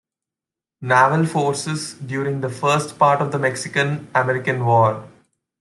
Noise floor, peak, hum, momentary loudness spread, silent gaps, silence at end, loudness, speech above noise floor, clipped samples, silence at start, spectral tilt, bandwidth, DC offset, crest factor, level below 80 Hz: -88 dBFS; -2 dBFS; none; 10 LU; none; 0.5 s; -19 LUFS; 69 dB; under 0.1%; 0.8 s; -5.5 dB/octave; 12 kHz; under 0.1%; 18 dB; -62 dBFS